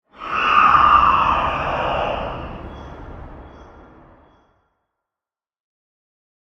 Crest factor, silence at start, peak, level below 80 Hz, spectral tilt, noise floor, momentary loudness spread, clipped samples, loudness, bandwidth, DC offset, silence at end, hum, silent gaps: 20 dB; 0.2 s; -2 dBFS; -40 dBFS; -5.5 dB/octave; under -90 dBFS; 25 LU; under 0.1%; -16 LUFS; 7.2 kHz; under 0.1%; 2.9 s; none; none